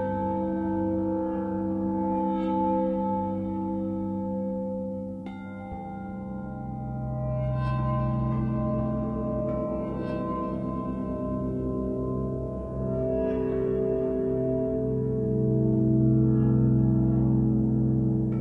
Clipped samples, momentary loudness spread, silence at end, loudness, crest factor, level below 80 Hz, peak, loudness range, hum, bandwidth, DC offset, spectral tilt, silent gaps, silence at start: under 0.1%; 11 LU; 0 s; -28 LUFS; 14 dB; -42 dBFS; -12 dBFS; 9 LU; none; 3.9 kHz; under 0.1%; -12 dB/octave; none; 0 s